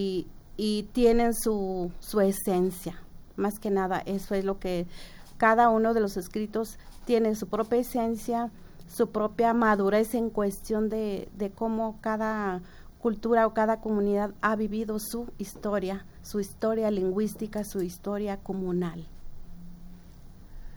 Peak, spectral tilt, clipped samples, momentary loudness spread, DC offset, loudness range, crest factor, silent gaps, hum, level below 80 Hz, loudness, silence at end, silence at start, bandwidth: -8 dBFS; -6 dB/octave; under 0.1%; 12 LU; under 0.1%; 4 LU; 20 dB; none; none; -46 dBFS; -28 LUFS; 0 s; 0 s; over 20 kHz